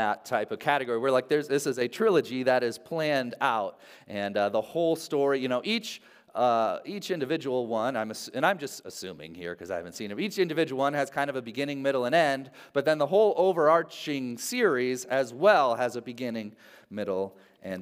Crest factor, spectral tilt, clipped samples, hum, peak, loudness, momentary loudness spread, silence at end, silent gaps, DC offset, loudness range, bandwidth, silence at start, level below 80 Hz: 20 dB; -4.5 dB/octave; under 0.1%; none; -8 dBFS; -27 LUFS; 14 LU; 0 s; none; under 0.1%; 5 LU; 16 kHz; 0 s; -80 dBFS